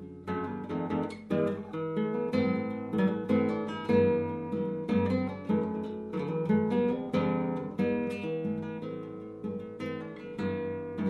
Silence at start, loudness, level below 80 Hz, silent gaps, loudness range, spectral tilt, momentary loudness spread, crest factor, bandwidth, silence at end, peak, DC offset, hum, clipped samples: 0 s; -31 LUFS; -66 dBFS; none; 5 LU; -9 dB/octave; 10 LU; 18 dB; 10 kHz; 0 s; -14 dBFS; under 0.1%; none; under 0.1%